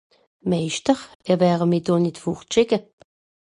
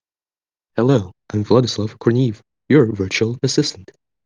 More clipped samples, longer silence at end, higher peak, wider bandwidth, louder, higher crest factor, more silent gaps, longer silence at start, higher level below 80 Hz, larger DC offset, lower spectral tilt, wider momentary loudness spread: neither; first, 0.75 s vs 0.4 s; second, -4 dBFS vs 0 dBFS; first, 11 kHz vs 9.8 kHz; second, -22 LUFS vs -18 LUFS; about the same, 18 dB vs 18 dB; first, 1.15-1.20 s vs none; second, 0.45 s vs 0.75 s; about the same, -58 dBFS vs -60 dBFS; neither; about the same, -6 dB/octave vs -6 dB/octave; second, 7 LU vs 10 LU